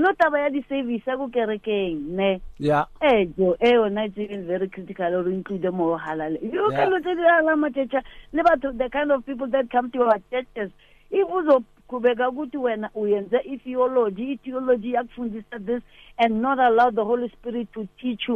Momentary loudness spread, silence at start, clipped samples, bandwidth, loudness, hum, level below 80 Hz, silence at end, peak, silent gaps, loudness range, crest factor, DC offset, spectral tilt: 11 LU; 0 s; under 0.1%; 6.8 kHz; -23 LUFS; none; -52 dBFS; 0 s; -6 dBFS; none; 3 LU; 16 dB; under 0.1%; -7.5 dB/octave